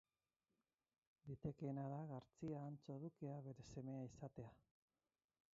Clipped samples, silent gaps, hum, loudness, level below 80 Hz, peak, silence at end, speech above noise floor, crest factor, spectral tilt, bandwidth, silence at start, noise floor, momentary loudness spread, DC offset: under 0.1%; none; none; -53 LUFS; -78 dBFS; -34 dBFS; 1 s; over 38 dB; 20 dB; -9.5 dB/octave; 7.4 kHz; 1.25 s; under -90 dBFS; 8 LU; under 0.1%